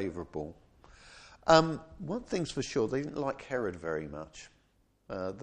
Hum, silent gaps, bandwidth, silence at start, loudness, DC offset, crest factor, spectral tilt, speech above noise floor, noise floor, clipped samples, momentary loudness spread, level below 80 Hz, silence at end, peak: none; none; 9.8 kHz; 0 s; -32 LUFS; under 0.1%; 26 dB; -5 dB/octave; 38 dB; -70 dBFS; under 0.1%; 20 LU; -58 dBFS; 0 s; -6 dBFS